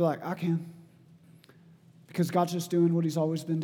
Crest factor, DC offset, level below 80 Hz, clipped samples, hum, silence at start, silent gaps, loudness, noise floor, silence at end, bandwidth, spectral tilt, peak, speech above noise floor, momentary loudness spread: 18 dB; under 0.1%; -82 dBFS; under 0.1%; none; 0 s; none; -29 LUFS; -57 dBFS; 0 s; 17 kHz; -7 dB/octave; -12 dBFS; 29 dB; 8 LU